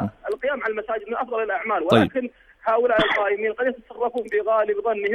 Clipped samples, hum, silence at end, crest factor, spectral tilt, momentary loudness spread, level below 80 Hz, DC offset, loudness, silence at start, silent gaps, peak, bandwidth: under 0.1%; none; 0 s; 20 dB; -6.5 dB/octave; 9 LU; -56 dBFS; under 0.1%; -23 LUFS; 0 s; none; -2 dBFS; 11.5 kHz